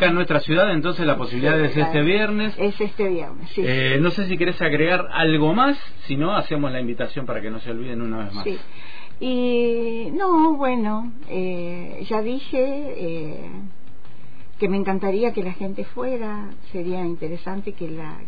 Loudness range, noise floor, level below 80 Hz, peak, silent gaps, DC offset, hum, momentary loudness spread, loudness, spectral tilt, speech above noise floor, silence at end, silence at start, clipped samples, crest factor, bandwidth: 7 LU; -47 dBFS; -52 dBFS; -6 dBFS; none; 7%; none; 13 LU; -22 LUFS; -8.5 dB/octave; 25 dB; 0 s; 0 s; under 0.1%; 16 dB; 5 kHz